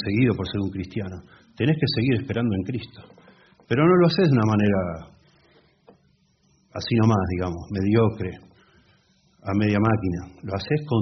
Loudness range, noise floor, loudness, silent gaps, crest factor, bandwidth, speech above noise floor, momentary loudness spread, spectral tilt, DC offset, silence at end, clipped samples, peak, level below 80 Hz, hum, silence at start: 4 LU; -63 dBFS; -23 LUFS; none; 18 dB; 6.4 kHz; 41 dB; 15 LU; -6.5 dB/octave; under 0.1%; 0 s; under 0.1%; -6 dBFS; -54 dBFS; none; 0 s